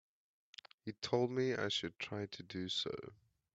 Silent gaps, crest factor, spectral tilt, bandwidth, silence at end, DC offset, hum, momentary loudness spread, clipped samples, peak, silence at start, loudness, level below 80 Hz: none; 22 dB; -4.5 dB/octave; 8 kHz; 0.4 s; under 0.1%; none; 21 LU; under 0.1%; -20 dBFS; 0.85 s; -39 LUFS; -78 dBFS